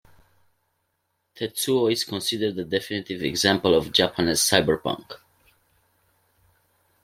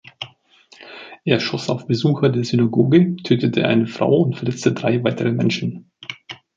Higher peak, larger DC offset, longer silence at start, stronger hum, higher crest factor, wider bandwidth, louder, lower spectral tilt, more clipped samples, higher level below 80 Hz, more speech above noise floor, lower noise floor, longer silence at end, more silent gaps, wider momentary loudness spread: about the same, -2 dBFS vs -2 dBFS; neither; first, 1.35 s vs 0.2 s; neither; first, 24 dB vs 18 dB; first, 16.5 kHz vs 7.6 kHz; second, -23 LUFS vs -19 LUFS; second, -3 dB/octave vs -7 dB/octave; neither; about the same, -58 dBFS vs -58 dBFS; first, 52 dB vs 33 dB; first, -75 dBFS vs -51 dBFS; first, 1.9 s vs 0.2 s; neither; second, 12 LU vs 18 LU